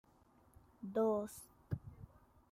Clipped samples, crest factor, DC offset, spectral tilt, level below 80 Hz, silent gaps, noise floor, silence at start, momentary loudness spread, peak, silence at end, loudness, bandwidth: under 0.1%; 18 dB; under 0.1%; -7.5 dB/octave; -68 dBFS; none; -69 dBFS; 0.8 s; 23 LU; -24 dBFS; 0.45 s; -40 LUFS; 16 kHz